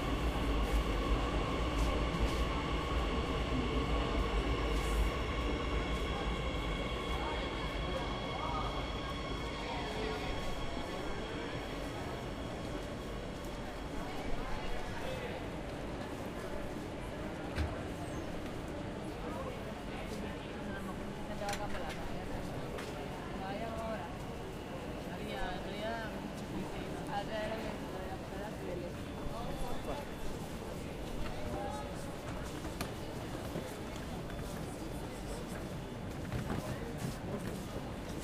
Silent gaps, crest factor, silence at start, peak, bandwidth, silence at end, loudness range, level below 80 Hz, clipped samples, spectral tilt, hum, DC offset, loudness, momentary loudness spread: none; 18 dB; 0 s; -20 dBFS; 15.5 kHz; 0 s; 7 LU; -42 dBFS; under 0.1%; -5.5 dB/octave; none; under 0.1%; -39 LUFS; 8 LU